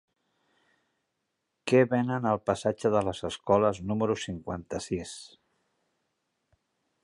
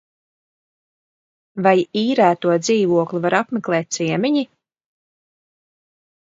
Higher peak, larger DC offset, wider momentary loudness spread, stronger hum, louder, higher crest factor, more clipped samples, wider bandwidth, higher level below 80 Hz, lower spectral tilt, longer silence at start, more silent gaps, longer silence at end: second, -10 dBFS vs 0 dBFS; neither; first, 12 LU vs 6 LU; neither; second, -28 LUFS vs -18 LUFS; about the same, 20 dB vs 20 dB; neither; first, 11.5 kHz vs 7.8 kHz; first, -58 dBFS vs -70 dBFS; about the same, -6 dB/octave vs -5 dB/octave; about the same, 1.65 s vs 1.55 s; neither; second, 1.75 s vs 1.95 s